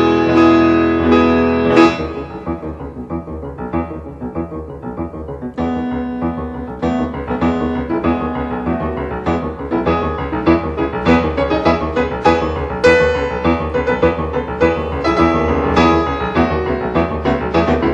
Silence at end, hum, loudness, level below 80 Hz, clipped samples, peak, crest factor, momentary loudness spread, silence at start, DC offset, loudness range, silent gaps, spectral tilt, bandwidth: 0 s; none; -16 LUFS; -30 dBFS; under 0.1%; 0 dBFS; 16 dB; 14 LU; 0 s; under 0.1%; 8 LU; none; -7 dB/octave; 8 kHz